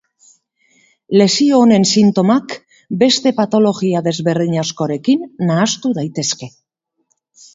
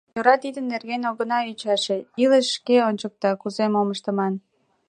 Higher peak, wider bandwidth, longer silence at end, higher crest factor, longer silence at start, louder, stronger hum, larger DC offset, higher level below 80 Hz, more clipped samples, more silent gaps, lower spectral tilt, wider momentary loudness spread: about the same, 0 dBFS vs -2 dBFS; second, 8 kHz vs 10 kHz; first, 1.05 s vs 0.5 s; about the same, 16 dB vs 20 dB; first, 1.1 s vs 0.15 s; first, -14 LUFS vs -22 LUFS; neither; neither; first, -60 dBFS vs -74 dBFS; neither; neither; about the same, -5 dB/octave vs -4.5 dB/octave; about the same, 9 LU vs 8 LU